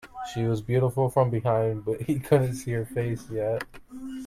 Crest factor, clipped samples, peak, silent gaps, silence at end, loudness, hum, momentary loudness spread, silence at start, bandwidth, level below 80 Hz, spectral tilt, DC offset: 18 dB; under 0.1%; -8 dBFS; none; 0 s; -27 LUFS; none; 10 LU; 0.05 s; 15 kHz; -52 dBFS; -7.5 dB/octave; under 0.1%